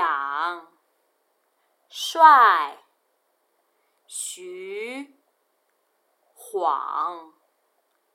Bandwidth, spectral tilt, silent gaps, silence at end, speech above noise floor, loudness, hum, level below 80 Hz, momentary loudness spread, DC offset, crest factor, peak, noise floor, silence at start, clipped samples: 16 kHz; 0.5 dB/octave; none; 0.9 s; 50 dB; -21 LUFS; none; under -90 dBFS; 23 LU; under 0.1%; 24 dB; -2 dBFS; -71 dBFS; 0 s; under 0.1%